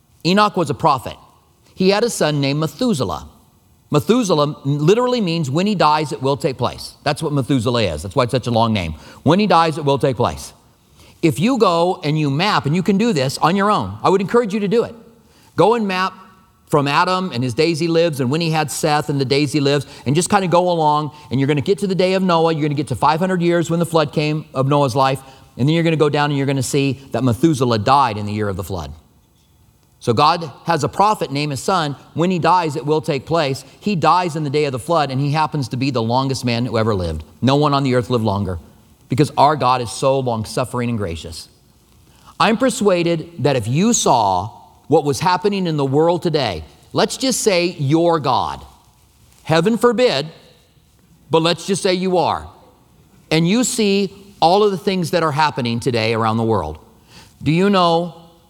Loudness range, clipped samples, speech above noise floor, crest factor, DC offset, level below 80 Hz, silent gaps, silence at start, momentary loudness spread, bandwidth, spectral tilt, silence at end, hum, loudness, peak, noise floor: 2 LU; under 0.1%; 37 dB; 18 dB; under 0.1%; -48 dBFS; none; 0.25 s; 8 LU; 17.5 kHz; -5.5 dB/octave; 0.3 s; none; -17 LUFS; 0 dBFS; -54 dBFS